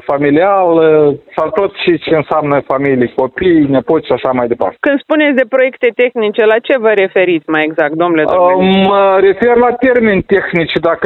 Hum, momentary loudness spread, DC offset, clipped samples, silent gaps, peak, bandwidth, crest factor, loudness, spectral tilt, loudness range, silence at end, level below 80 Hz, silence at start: none; 5 LU; under 0.1%; under 0.1%; none; 0 dBFS; 4.3 kHz; 10 dB; -11 LUFS; -8.5 dB/octave; 2 LU; 0 s; -44 dBFS; 0.05 s